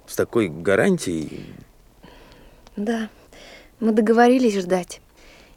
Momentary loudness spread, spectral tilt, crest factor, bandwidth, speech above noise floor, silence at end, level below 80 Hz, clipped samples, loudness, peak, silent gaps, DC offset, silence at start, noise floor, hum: 22 LU; -5.5 dB/octave; 18 dB; 16.5 kHz; 29 dB; 0.6 s; -54 dBFS; under 0.1%; -20 LUFS; -4 dBFS; none; under 0.1%; 0.1 s; -49 dBFS; none